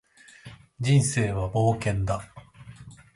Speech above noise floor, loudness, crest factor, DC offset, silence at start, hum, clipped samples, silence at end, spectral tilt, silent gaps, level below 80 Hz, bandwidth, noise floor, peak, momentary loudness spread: 25 dB; -25 LUFS; 16 dB; under 0.1%; 0.45 s; none; under 0.1%; 0.2 s; -5.5 dB/octave; none; -46 dBFS; 11.5 kHz; -49 dBFS; -10 dBFS; 25 LU